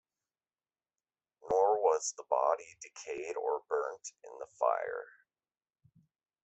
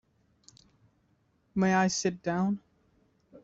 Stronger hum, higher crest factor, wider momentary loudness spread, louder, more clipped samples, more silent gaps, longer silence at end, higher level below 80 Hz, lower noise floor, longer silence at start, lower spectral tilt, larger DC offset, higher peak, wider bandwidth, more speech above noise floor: neither; about the same, 22 dB vs 20 dB; first, 19 LU vs 10 LU; second, -33 LUFS vs -29 LUFS; neither; neither; first, 1.4 s vs 0.05 s; second, -78 dBFS vs -68 dBFS; first, under -90 dBFS vs -70 dBFS; about the same, 1.45 s vs 1.55 s; second, -2 dB/octave vs -5 dB/octave; neither; about the same, -14 dBFS vs -12 dBFS; about the same, 8.2 kHz vs 7.8 kHz; first, over 54 dB vs 43 dB